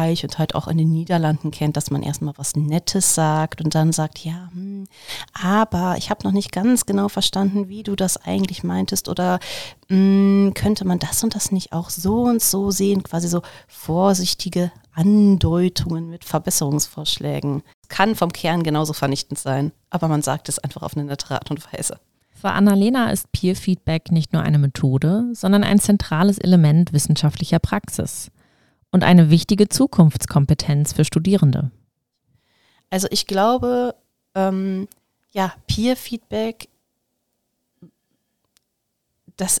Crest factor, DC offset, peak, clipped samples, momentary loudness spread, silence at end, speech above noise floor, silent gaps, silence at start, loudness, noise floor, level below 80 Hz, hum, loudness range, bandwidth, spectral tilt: 18 dB; 0.3%; 0 dBFS; under 0.1%; 12 LU; 0 s; 56 dB; 17.74-17.82 s; 0 s; -19 LUFS; -75 dBFS; -44 dBFS; none; 7 LU; 18 kHz; -5.5 dB/octave